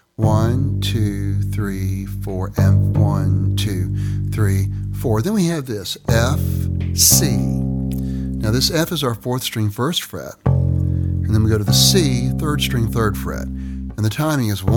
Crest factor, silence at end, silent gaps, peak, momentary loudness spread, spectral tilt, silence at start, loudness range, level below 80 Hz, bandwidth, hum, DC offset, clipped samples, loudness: 18 dB; 0 s; none; 0 dBFS; 10 LU; -5 dB/octave; 0.2 s; 3 LU; -32 dBFS; 18.5 kHz; none; under 0.1%; under 0.1%; -18 LUFS